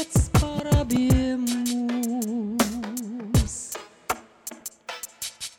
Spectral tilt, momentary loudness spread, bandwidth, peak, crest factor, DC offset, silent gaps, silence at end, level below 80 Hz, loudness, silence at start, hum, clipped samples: -5.5 dB/octave; 14 LU; 19.5 kHz; -8 dBFS; 16 dB; under 0.1%; none; 0.1 s; -34 dBFS; -25 LUFS; 0 s; none; under 0.1%